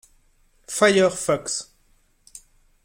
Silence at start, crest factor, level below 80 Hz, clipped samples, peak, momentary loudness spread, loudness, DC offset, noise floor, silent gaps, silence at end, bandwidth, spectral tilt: 0.7 s; 20 dB; -58 dBFS; under 0.1%; -4 dBFS; 13 LU; -21 LUFS; under 0.1%; -61 dBFS; none; 0.45 s; 16.5 kHz; -3.5 dB/octave